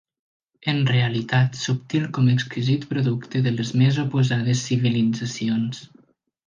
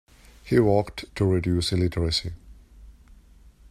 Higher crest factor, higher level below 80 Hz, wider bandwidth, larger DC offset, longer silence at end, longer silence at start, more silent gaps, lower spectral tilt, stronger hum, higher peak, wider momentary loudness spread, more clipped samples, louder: about the same, 16 dB vs 18 dB; second, -60 dBFS vs -44 dBFS; second, 7.4 kHz vs 14 kHz; neither; about the same, 0.6 s vs 0.55 s; first, 0.65 s vs 0.45 s; neither; about the same, -6 dB/octave vs -6 dB/octave; neither; about the same, -6 dBFS vs -8 dBFS; second, 6 LU vs 13 LU; neither; about the same, -22 LUFS vs -24 LUFS